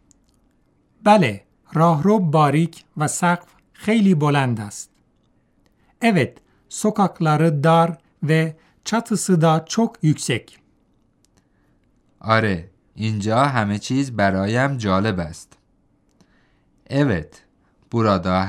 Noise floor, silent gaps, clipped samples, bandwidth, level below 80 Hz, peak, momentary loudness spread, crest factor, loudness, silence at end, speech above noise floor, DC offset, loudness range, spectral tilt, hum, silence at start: -62 dBFS; none; under 0.1%; 14 kHz; -58 dBFS; -2 dBFS; 12 LU; 18 dB; -19 LUFS; 0 s; 43 dB; under 0.1%; 5 LU; -6 dB/octave; none; 1.05 s